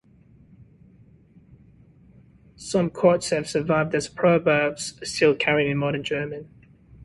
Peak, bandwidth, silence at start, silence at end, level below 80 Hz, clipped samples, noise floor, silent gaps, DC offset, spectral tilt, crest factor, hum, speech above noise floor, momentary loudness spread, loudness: -4 dBFS; 11.5 kHz; 0.6 s; 0 s; -56 dBFS; under 0.1%; -54 dBFS; none; under 0.1%; -5 dB/octave; 20 dB; none; 31 dB; 10 LU; -23 LUFS